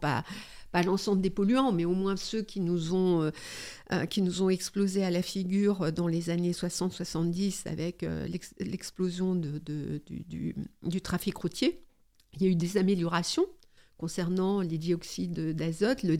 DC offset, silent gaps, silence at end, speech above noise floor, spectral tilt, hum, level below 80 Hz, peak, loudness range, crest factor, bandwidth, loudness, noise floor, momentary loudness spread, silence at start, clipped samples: under 0.1%; none; 0 s; 32 dB; -6 dB/octave; none; -56 dBFS; -14 dBFS; 5 LU; 16 dB; 16 kHz; -31 LUFS; -61 dBFS; 10 LU; 0 s; under 0.1%